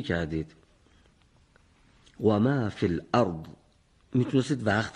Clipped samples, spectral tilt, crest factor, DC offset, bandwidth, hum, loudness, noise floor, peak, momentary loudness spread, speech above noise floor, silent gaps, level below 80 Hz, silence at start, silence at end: under 0.1%; -7 dB/octave; 22 dB; under 0.1%; 11 kHz; none; -27 LUFS; -63 dBFS; -8 dBFS; 12 LU; 36 dB; none; -54 dBFS; 0 s; 0.05 s